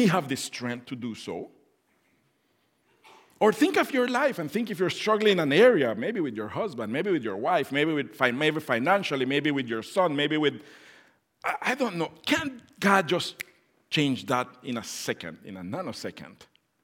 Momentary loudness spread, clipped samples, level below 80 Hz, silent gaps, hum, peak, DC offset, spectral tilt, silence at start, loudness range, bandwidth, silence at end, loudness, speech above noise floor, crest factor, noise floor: 14 LU; under 0.1%; -76 dBFS; none; none; -6 dBFS; under 0.1%; -5 dB/octave; 0 s; 7 LU; 17 kHz; 0.4 s; -26 LUFS; 44 dB; 22 dB; -70 dBFS